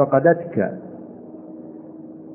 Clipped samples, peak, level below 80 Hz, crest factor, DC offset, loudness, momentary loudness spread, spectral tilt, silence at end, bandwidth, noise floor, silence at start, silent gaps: under 0.1%; -2 dBFS; -68 dBFS; 20 dB; under 0.1%; -20 LUFS; 22 LU; -14 dB/octave; 0 s; 2.9 kHz; -38 dBFS; 0 s; none